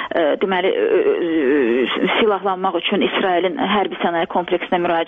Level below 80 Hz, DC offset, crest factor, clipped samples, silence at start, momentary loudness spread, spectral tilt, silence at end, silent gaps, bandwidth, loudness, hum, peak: -56 dBFS; under 0.1%; 16 dB; under 0.1%; 0 s; 4 LU; -7.5 dB/octave; 0 s; none; 4.5 kHz; -18 LUFS; none; -2 dBFS